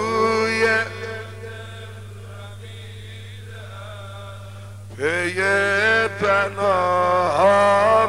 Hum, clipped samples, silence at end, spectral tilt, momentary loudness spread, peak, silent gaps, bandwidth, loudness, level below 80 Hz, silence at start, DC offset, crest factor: 50 Hz at -35 dBFS; under 0.1%; 0 s; -4.5 dB/octave; 21 LU; -6 dBFS; none; 15.5 kHz; -18 LUFS; -54 dBFS; 0 s; 0.4%; 16 dB